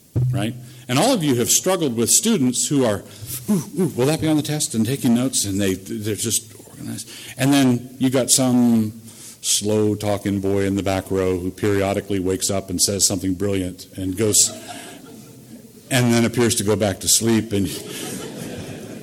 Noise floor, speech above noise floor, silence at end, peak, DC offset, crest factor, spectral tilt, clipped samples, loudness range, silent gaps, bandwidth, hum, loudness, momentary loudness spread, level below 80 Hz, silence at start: -42 dBFS; 22 dB; 0 s; -2 dBFS; under 0.1%; 18 dB; -4 dB/octave; under 0.1%; 3 LU; none; 17 kHz; none; -19 LUFS; 16 LU; -52 dBFS; 0.15 s